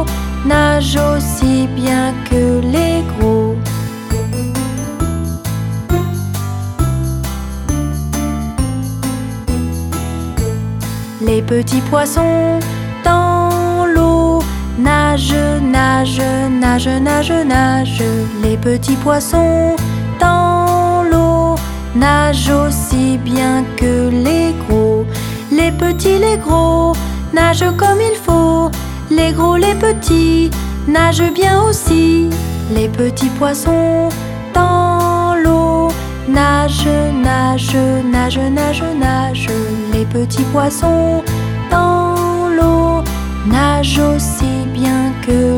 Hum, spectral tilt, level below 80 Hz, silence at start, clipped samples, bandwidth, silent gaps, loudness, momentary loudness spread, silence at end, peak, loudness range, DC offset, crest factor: none; -6 dB/octave; -24 dBFS; 0 s; under 0.1%; 19 kHz; none; -14 LUFS; 8 LU; 0 s; 0 dBFS; 6 LU; under 0.1%; 12 dB